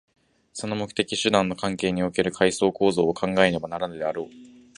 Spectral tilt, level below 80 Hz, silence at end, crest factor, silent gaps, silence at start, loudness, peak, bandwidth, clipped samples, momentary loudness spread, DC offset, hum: -4.5 dB/octave; -56 dBFS; 0.3 s; 22 dB; none; 0.55 s; -24 LUFS; -2 dBFS; 11.5 kHz; under 0.1%; 9 LU; under 0.1%; none